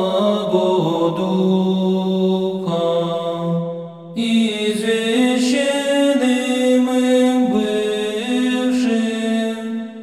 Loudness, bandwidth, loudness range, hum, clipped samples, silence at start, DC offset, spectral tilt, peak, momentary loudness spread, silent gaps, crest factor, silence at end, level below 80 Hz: -18 LUFS; 13.5 kHz; 3 LU; none; under 0.1%; 0 s; 0.1%; -5.5 dB/octave; -4 dBFS; 6 LU; none; 12 dB; 0 s; -62 dBFS